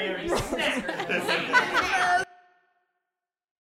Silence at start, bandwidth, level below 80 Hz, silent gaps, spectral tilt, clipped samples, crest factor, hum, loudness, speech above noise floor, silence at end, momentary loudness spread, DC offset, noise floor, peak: 0 s; 16 kHz; -52 dBFS; none; -3 dB/octave; under 0.1%; 20 dB; none; -25 LUFS; 60 dB; 1.45 s; 6 LU; under 0.1%; -88 dBFS; -8 dBFS